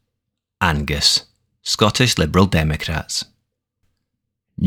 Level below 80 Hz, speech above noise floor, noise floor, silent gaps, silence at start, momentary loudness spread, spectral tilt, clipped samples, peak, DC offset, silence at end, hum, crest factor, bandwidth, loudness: -34 dBFS; 61 dB; -79 dBFS; none; 0.6 s; 10 LU; -4 dB/octave; under 0.1%; 0 dBFS; under 0.1%; 0 s; none; 20 dB; 19.5 kHz; -17 LUFS